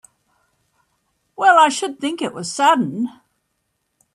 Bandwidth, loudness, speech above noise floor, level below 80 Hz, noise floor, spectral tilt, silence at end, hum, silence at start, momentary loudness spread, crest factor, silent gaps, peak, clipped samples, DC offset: 13 kHz; -17 LUFS; 55 dB; -72 dBFS; -72 dBFS; -3 dB/octave; 1.05 s; none; 1.4 s; 13 LU; 20 dB; none; 0 dBFS; under 0.1%; under 0.1%